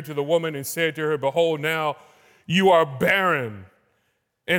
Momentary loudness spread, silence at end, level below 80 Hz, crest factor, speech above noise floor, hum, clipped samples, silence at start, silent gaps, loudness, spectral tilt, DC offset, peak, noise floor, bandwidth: 10 LU; 0 s; -64 dBFS; 16 dB; 50 dB; none; under 0.1%; 0 s; none; -22 LUFS; -4.5 dB/octave; under 0.1%; -6 dBFS; -72 dBFS; 18 kHz